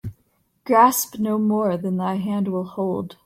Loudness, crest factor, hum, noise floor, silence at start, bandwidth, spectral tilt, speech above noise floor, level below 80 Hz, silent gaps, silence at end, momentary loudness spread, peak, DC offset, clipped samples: -21 LUFS; 18 dB; none; -66 dBFS; 0.05 s; 16.5 kHz; -5.5 dB/octave; 45 dB; -58 dBFS; none; 0.1 s; 10 LU; -4 dBFS; under 0.1%; under 0.1%